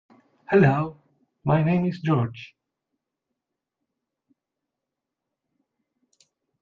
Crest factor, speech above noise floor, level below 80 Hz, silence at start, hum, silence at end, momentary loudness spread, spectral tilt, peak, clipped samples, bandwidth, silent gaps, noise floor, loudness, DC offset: 22 dB; 64 dB; -62 dBFS; 0.5 s; none; 4.15 s; 14 LU; -9.5 dB/octave; -4 dBFS; under 0.1%; 6.6 kHz; none; -85 dBFS; -23 LUFS; under 0.1%